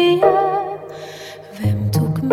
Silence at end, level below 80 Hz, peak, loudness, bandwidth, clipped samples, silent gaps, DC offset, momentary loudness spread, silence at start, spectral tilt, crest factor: 0 s; -48 dBFS; -2 dBFS; -18 LUFS; 16 kHz; under 0.1%; none; under 0.1%; 19 LU; 0 s; -7 dB/octave; 16 dB